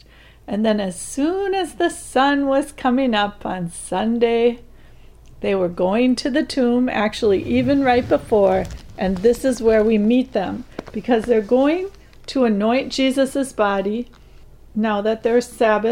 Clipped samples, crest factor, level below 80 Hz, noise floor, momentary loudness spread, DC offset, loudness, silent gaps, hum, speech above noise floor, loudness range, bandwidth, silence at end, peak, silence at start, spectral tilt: under 0.1%; 14 dB; -44 dBFS; -43 dBFS; 10 LU; under 0.1%; -19 LUFS; none; none; 25 dB; 3 LU; 16 kHz; 0 s; -4 dBFS; 0.45 s; -5.5 dB/octave